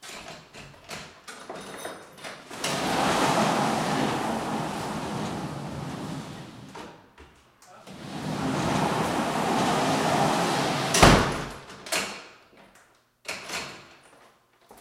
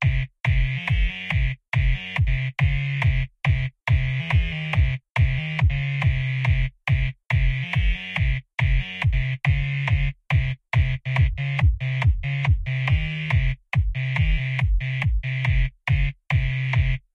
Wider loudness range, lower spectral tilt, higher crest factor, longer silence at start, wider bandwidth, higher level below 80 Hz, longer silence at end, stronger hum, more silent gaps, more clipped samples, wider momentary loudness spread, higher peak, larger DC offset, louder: first, 13 LU vs 1 LU; second, -4 dB/octave vs -7 dB/octave; first, 28 dB vs 12 dB; about the same, 0 s vs 0 s; first, 16 kHz vs 6.8 kHz; second, -44 dBFS vs -26 dBFS; about the same, 0.05 s vs 0.15 s; neither; second, none vs 5.10-5.15 s; neither; first, 20 LU vs 2 LU; first, 0 dBFS vs -10 dBFS; neither; about the same, -26 LUFS vs -24 LUFS